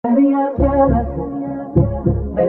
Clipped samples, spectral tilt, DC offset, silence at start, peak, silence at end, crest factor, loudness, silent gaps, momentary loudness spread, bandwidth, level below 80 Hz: under 0.1%; -13.5 dB/octave; under 0.1%; 0.05 s; -2 dBFS; 0 s; 14 dB; -17 LUFS; none; 10 LU; 3.2 kHz; -26 dBFS